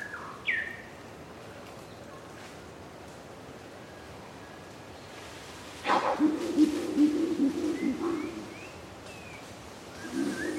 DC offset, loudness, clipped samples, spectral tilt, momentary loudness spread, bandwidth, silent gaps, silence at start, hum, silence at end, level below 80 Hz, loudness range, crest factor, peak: under 0.1%; -30 LUFS; under 0.1%; -5 dB/octave; 20 LU; 15 kHz; none; 0 s; none; 0 s; -62 dBFS; 17 LU; 22 dB; -12 dBFS